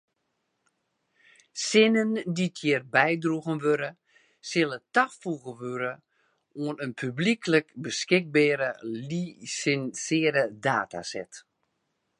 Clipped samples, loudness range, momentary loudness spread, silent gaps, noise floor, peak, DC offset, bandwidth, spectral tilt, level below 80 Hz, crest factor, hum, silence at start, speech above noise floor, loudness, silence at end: under 0.1%; 4 LU; 13 LU; none; -78 dBFS; -4 dBFS; under 0.1%; 11 kHz; -4.5 dB/octave; -76 dBFS; 24 dB; none; 1.55 s; 51 dB; -27 LUFS; 0.8 s